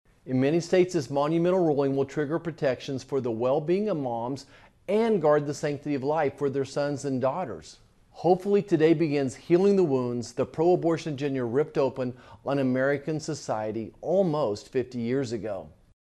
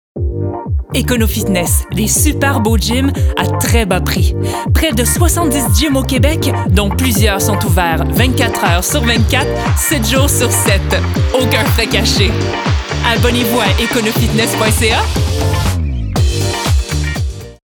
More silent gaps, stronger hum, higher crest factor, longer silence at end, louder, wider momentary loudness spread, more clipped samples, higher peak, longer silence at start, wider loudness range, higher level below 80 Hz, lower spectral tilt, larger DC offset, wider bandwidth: neither; neither; first, 18 dB vs 12 dB; first, 0.4 s vs 0.2 s; second, -27 LUFS vs -13 LUFS; first, 10 LU vs 5 LU; neither; second, -10 dBFS vs 0 dBFS; about the same, 0.25 s vs 0.15 s; first, 4 LU vs 1 LU; second, -62 dBFS vs -20 dBFS; first, -7 dB/octave vs -4.5 dB/octave; neither; second, 11.5 kHz vs 20 kHz